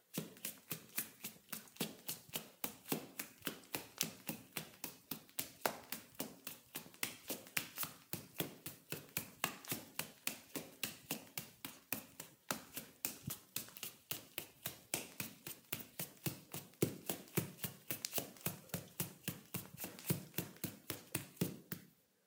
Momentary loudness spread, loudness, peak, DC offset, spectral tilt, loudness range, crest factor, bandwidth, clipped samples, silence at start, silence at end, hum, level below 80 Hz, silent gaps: 8 LU; -45 LUFS; -10 dBFS; under 0.1%; -3 dB/octave; 3 LU; 38 dB; 19 kHz; under 0.1%; 0.15 s; 0.35 s; none; -80 dBFS; none